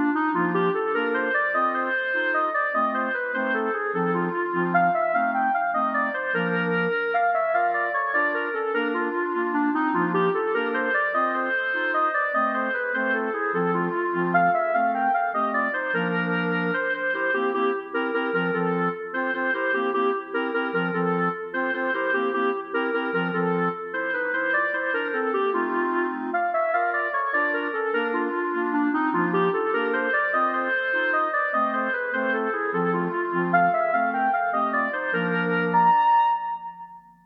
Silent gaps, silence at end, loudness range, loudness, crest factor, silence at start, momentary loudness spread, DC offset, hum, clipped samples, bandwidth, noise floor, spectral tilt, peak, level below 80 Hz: none; 0.25 s; 2 LU; -24 LUFS; 14 dB; 0 s; 4 LU; under 0.1%; none; under 0.1%; 5.4 kHz; -44 dBFS; -9 dB/octave; -8 dBFS; -74 dBFS